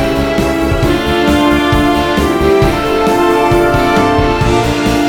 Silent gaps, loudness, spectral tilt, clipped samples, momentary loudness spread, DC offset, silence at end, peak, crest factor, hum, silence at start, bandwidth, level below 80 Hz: none; -11 LUFS; -6 dB/octave; under 0.1%; 3 LU; under 0.1%; 0 s; 0 dBFS; 10 dB; none; 0 s; 19 kHz; -22 dBFS